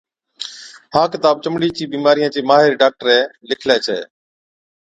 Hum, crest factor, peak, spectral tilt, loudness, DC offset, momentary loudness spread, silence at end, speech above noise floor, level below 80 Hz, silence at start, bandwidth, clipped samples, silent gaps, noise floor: none; 16 dB; 0 dBFS; -4.5 dB/octave; -16 LUFS; under 0.1%; 16 LU; 0.8 s; 20 dB; -60 dBFS; 0.4 s; 9.2 kHz; under 0.1%; none; -35 dBFS